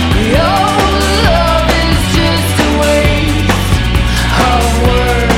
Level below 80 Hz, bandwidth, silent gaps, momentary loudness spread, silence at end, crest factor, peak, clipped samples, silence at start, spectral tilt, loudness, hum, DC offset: -16 dBFS; 17 kHz; none; 2 LU; 0 s; 10 dB; 0 dBFS; under 0.1%; 0 s; -5 dB/octave; -11 LUFS; none; under 0.1%